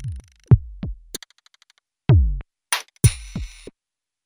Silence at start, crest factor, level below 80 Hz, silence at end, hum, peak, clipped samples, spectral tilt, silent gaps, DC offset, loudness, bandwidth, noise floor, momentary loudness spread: 0 s; 20 dB; -30 dBFS; 0.8 s; none; -2 dBFS; under 0.1%; -5 dB/octave; none; under 0.1%; -21 LUFS; over 20 kHz; -87 dBFS; 18 LU